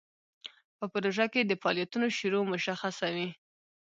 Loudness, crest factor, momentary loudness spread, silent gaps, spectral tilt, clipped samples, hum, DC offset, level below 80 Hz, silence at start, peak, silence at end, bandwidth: -31 LUFS; 22 dB; 19 LU; 0.64-0.79 s; -4.5 dB/octave; under 0.1%; none; under 0.1%; -80 dBFS; 0.45 s; -12 dBFS; 0.65 s; 7.8 kHz